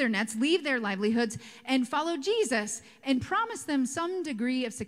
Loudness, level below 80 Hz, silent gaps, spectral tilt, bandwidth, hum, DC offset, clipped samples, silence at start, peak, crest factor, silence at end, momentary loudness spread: -29 LUFS; -68 dBFS; none; -3.5 dB/octave; 15.5 kHz; none; under 0.1%; under 0.1%; 0 s; -14 dBFS; 14 dB; 0 s; 5 LU